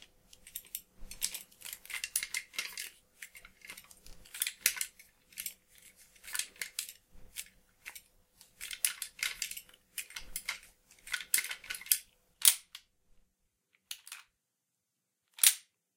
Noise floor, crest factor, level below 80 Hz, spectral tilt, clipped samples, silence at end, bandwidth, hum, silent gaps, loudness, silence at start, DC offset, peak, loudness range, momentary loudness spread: -85 dBFS; 38 dB; -64 dBFS; 3.5 dB/octave; under 0.1%; 0.35 s; 17 kHz; none; none; -33 LUFS; 0 s; under 0.1%; -2 dBFS; 8 LU; 25 LU